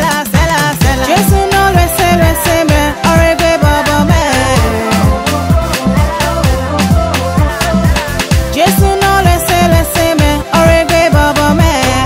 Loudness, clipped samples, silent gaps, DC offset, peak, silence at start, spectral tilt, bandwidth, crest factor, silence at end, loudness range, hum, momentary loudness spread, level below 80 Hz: -10 LUFS; under 0.1%; none; under 0.1%; 0 dBFS; 0 s; -5 dB/octave; 16.5 kHz; 10 dB; 0 s; 3 LU; none; 4 LU; -18 dBFS